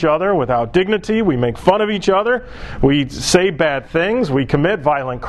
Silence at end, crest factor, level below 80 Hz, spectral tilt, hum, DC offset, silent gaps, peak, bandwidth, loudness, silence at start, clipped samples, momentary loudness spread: 0 s; 16 dB; -36 dBFS; -5.5 dB/octave; none; under 0.1%; none; 0 dBFS; 12.5 kHz; -16 LUFS; 0 s; under 0.1%; 3 LU